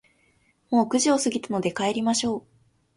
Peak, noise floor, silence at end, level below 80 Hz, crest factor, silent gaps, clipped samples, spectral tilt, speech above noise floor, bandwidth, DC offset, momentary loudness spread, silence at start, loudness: -10 dBFS; -65 dBFS; 0.55 s; -64 dBFS; 16 dB; none; under 0.1%; -3.5 dB/octave; 41 dB; 11.5 kHz; under 0.1%; 7 LU; 0.7 s; -24 LUFS